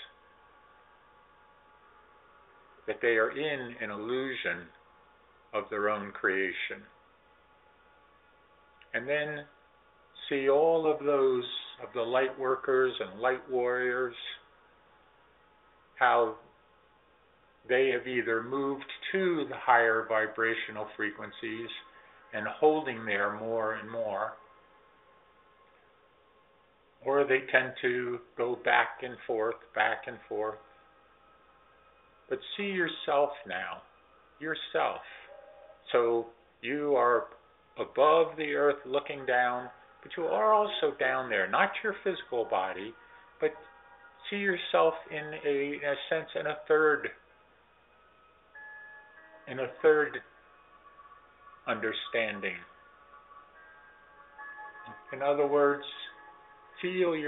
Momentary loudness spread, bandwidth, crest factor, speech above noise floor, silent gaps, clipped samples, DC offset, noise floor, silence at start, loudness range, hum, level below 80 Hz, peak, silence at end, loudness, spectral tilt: 17 LU; 4.1 kHz; 24 dB; 35 dB; none; under 0.1%; under 0.1%; -65 dBFS; 0 s; 8 LU; none; -74 dBFS; -8 dBFS; 0 s; -30 LUFS; -2 dB/octave